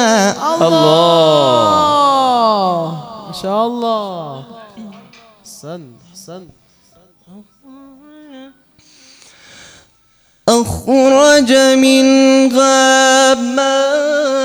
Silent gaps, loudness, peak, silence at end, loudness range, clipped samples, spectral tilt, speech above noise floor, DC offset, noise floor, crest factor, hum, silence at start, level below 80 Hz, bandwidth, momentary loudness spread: none; -11 LUFS; 0 dBFS; 0 s; 13 LU; under 0.1%; -3.5 dB/octave; 43 dB; under 0.1%; -54 dBFS; 14 dB; none; 0 s; -50 dBFS; over 20 kHz; 20 LU